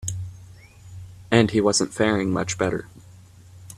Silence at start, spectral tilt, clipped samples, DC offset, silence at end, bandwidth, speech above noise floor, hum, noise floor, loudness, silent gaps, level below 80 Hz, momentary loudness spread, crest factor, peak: 0 s; -4.5 dB/octave; under 0.1%; under 0.1%; 0 s; 14.5 kHz; 26 dB; none; -47 dBFS; -22 LUFS; none; -52 dBFS; 23 LU; 24 dB; 0 dBFS